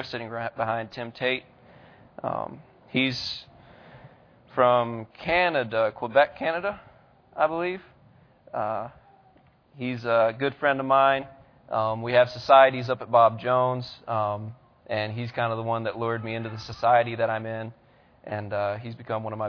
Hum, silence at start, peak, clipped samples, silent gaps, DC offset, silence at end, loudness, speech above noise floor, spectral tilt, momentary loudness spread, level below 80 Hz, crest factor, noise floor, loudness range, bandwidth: none; 0 s; -4 dBFS; under 0.1%; none; under 0.1%; 0 s; -25 LUFS; 34 dB; -6.5 dB/octave; 15 LU; -62 dBFS; 22 dB; -59 dBFS; 9 LU; 5.4 kHz